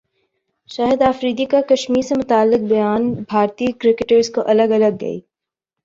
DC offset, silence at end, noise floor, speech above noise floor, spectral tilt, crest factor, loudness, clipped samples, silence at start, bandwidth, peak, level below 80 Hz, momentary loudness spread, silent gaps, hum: under 0.1%; 0.65 s; -85 dBFS; 69 dB; -5.5 dB/octave; 14 dB; -17 LUFS; under 0.1%; 0.7 s; 7.8 kHz; -2 dBFS; -54 dBFS; 6 LU; none; none